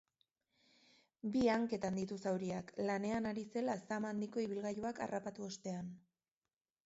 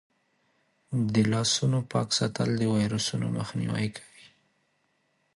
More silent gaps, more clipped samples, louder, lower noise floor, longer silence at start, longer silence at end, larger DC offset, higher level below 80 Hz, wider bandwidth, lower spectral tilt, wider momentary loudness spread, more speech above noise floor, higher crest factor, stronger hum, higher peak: neither; neither; second, -40 LUFS vs -27 LUFS; first, under -90 dBFS vs -72 dBFS; first, 1.25 s vs 0.9 s; second, 0.85 s vs 1.3 s; neither; second, -72 dBFS vs -60 dBFS; second, 8 kHz vs 11.5 kHz; about the same, -5.5 dB/octave vs -5 dB/octave; first, 11 LU vs 7 LU; first, over 50 dB vs 46 dB; about the same, 18 dB vs 18 dB; neither; second, -22 dBFS vs -12 dBFS